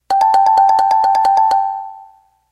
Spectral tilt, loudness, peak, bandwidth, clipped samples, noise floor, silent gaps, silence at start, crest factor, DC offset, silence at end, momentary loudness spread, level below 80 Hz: -1.5 dB/octave; -12 LUFS; -2 dBFS; 12.5 kHz; under 0.1%; -45 dBFS; none; 0.1 s; 12 dB; under 0.1%; 0.5 s; 12 LU; -56 dBFS